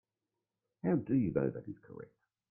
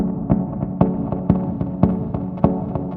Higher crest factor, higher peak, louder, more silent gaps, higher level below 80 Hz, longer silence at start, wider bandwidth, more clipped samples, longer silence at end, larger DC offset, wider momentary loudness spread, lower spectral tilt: about the same, 20 dB vs 20 dB; second, -18 dBFS vs 0 dBFS; second, -34 LUFS vs -21 LUFS; neither; second, -68 dBFS vs -36 dBFS; first, 0.85 s vs 0 s; second, 2.9 kHz vs 3.6 kHz; neither; first, 0.45 s vs 0 s; neither; first, 19 LU vs 5 LU; about the same, -13.5 dB/octave vs -13 dB/octave